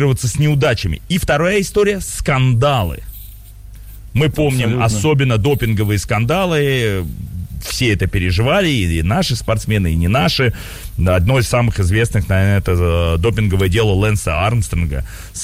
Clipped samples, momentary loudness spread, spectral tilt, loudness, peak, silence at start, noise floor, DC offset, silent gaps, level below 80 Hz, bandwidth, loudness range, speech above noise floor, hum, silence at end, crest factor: under 0.1%; 8 LU; -5.5 dB/octave; -16 LUFS; -4 dBFS; 0 s; -35 dBFS; under 0.1%; none; -28 dBFS; 16.5 kHz; 2 LU; 20 dB; none; 0 s; 10 dB